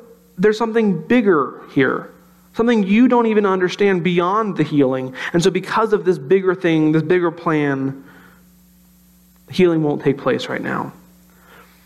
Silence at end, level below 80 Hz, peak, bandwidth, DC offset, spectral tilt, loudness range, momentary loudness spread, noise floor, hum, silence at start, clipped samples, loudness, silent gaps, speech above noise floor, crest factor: 0.95 s; -56 dBFS; -4 dBFS; 12.5 kHz; under 0.1%; -6.5 dB/octave; 5 LU; 9 LU; -51 dBFS; none; 0.4 s; under 0.1%; -17 LUFS; none; 34 dB; 14 dB